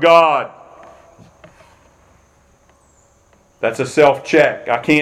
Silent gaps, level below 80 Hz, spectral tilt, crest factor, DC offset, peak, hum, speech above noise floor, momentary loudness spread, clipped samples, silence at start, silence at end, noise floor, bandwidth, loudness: none; -58 dBFS; -5 dB/octave; 18 dB; under 0.1%; 0 dBFS; none; 40 dB; 11 LU; under 0.1%; 0 s; 0 s; -53 dBFS; 13.5 kHz; -15 LUFS